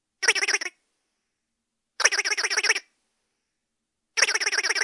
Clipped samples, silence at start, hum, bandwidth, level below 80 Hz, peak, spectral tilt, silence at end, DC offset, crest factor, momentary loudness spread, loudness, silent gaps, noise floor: under 0.1%; 0.2 s; none; 11.5 kHz; -78 dBFS; -2 dBFS; 4 dB/octave; 0 s; under 0.1%; 26 dB; 6 LU; -22 LUFS; none; -81 dBFS